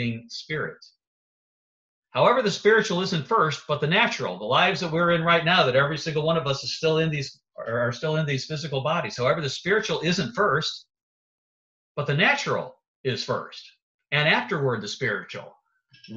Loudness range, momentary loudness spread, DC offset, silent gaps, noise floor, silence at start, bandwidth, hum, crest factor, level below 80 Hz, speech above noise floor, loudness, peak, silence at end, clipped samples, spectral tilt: 5 LU; 12 LU; under 0.1%; 1.07-2.03 s, 11.03-11.95 s, 12.88-13.04 s, 13.82-13.99 s; -56 dBFS; 0 s; 8 kHz; none; 20 dB; -62 dBFS; 32 dB; -24 LUFS; -6 dBFS; 0 s; under 0.1%; -4.5 dB/octave